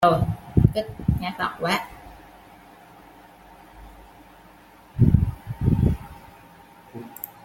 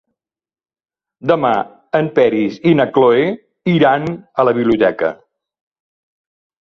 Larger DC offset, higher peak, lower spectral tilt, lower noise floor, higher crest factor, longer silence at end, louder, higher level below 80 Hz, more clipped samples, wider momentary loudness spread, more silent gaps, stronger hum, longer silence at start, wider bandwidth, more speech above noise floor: neither; about the same, -2 dBFS vs -2 dBFS; about the same, -7.5 dB/octave vs -8.5 dB/octave; second, -50 dBFS vs -90 dBFS; first, 22 dB vs 16 dB; second, 0.2 s vs 1.55 s; second, -23 LUFS vs -15 LUFS; first, -36 dBFS vs -56 dBFS; neither; first, 23 LU vs 9 LU; neither; neither; second, 0 s vs 1.25 s; first, 17 kHz vs 6.4 kHz; second, 26 dB vs 76 dB